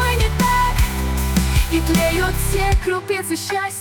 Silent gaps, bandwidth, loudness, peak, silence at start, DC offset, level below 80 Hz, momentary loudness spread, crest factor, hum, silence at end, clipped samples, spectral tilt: none; 19 kHz; -19 LUFS; -6 dBFS; 0 s; under 0.1%; -22 dBFS; 5 LU; 12 dB; none; 0 s; under 0.1%; -4.5 dB/octave